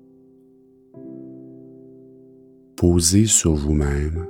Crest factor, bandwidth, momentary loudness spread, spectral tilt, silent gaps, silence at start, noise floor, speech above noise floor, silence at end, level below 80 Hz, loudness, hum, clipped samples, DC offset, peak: 20 dB; 19 kHz; 25 LU; -4.5 dB/octave; none; 0.95 s; -52 dBFS; 35 dB; 0 s; -32 dBFS; -17 LUFS; none; under 0.1%; under 0.1%; -2 dBFS